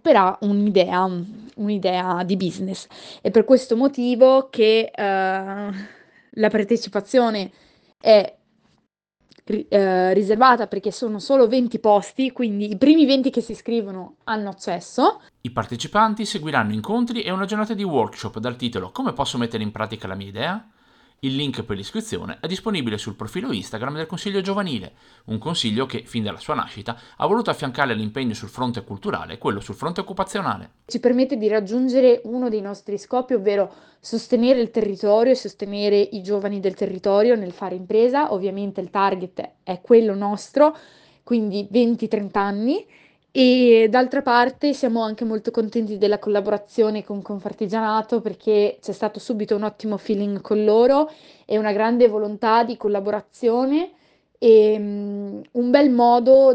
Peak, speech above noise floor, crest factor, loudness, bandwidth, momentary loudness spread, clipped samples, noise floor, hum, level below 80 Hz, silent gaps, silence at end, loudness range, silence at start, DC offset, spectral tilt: 0 dBFS; 49 dB; 20 dB; -21 LUFS; 10.5 kHz; 13 LU; under 0.1%; -69 dBFS; none; -60 dBFS; none; 0 s; 7 LU; 0.05 s; under 0.1%; -6 dB/octave